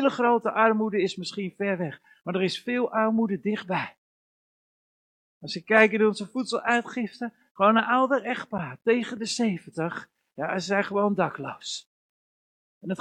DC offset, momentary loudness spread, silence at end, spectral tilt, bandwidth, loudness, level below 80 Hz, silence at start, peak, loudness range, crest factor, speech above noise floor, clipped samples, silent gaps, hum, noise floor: under 0.1%; 14 LU; 0.05 s; -5 dB/octave; 10.5 kHz; -26 LUFS; -72 dBFS; 0 s; -4 dBFS; 5 LU; 22 dB; over 65 dB; under 0.1%; 3.98-5.41 s, 7.51-7.55 s, 11.86-12.81 s; none; under -90 dBFS